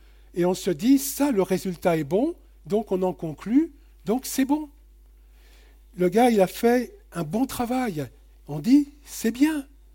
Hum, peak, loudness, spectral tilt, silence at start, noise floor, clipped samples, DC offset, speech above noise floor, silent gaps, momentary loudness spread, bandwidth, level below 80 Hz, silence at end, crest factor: none; -8 dBFS; -24 LUFS; -5.5 dB/octave; 0.35 s; -51 dBFS; under 0.1%; under 0.1%; 28 dB; none; 13 LU; 17 kHz; -50 dBFS; 0.3 s; 16 dB